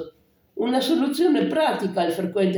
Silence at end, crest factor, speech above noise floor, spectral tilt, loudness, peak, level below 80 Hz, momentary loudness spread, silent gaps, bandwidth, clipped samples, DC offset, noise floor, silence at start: 0 s; 14 dB; 30 dB; -5.5 dB/octave; -22 LUFS; -10 dBFS; -70 dBFS; 8 LU; none; over 20 kHz; under 0.1%; under 0.1%; -51 dBFS; 0 s